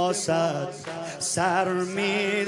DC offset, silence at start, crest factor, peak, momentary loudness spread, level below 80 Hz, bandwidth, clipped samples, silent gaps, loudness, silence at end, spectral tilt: under 0.1%; 0 s; 16 dB; -10 dBFS; 10 LU; -72 dBFS; 11.5 kHz; under 0.1%; none; -26 LUFS; 0 s; -3.5 dB/octave